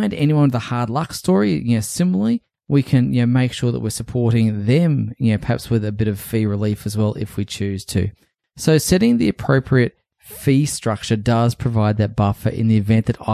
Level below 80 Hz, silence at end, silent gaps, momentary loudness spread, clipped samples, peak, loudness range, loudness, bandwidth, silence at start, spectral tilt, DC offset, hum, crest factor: -40 dBFS; 0 s; none; 7 LU; under 0.1%; -2 dBFS; 3 LU; -19 LUFS; 15 kHz; 0 s; -6.5 dB/octave; under 0.1%; none; 16 dB